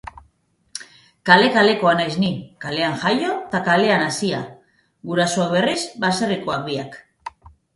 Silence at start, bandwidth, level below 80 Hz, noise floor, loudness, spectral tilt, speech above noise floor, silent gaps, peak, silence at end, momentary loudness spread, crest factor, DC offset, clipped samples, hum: 0.75 s; 11.5 kHz; -56 dBFS; -62 dBFS; -19 LUFS; -4.5 dB/octave; 43 dB; none; 0 dBFS; 0.45 s; 21 LU; 20 dB; under 0.1%; under 0.1%; none